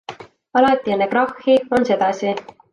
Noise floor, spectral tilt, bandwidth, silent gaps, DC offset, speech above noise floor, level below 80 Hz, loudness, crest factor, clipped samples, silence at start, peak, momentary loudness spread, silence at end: -37 dBFS; -5.5 dB/octave; 10.5 kHz; none; under 0.1%; 20 dB; -58 dBFS; -18 LUFS; 16 dB; under 0.1%; 0.1 s; -2 dBFS; 8 LU; 0.3 s